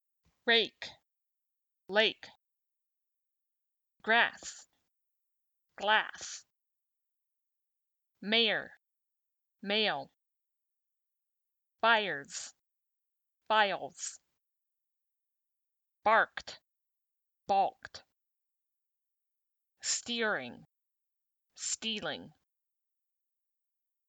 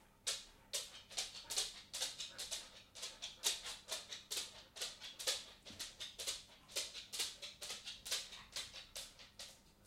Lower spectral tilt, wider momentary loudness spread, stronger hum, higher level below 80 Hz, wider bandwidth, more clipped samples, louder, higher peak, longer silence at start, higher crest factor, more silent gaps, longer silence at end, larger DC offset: first, -1 dB/octave vs 1 dB/octave; first, 19 LU vs 9 LU; neither; second, -82 dBFS vs -72 dBFS; first, over 20 kHz vs 16.5 kHz; neither; first, -31 LUFS vs -44 LUFS; first, -12 dBFS vs -22 dBFS; first, 0.45 s vs 0 s; about the same, 24 dB vs 26 dB; neither; first, 1.8 s vs 0 s; neither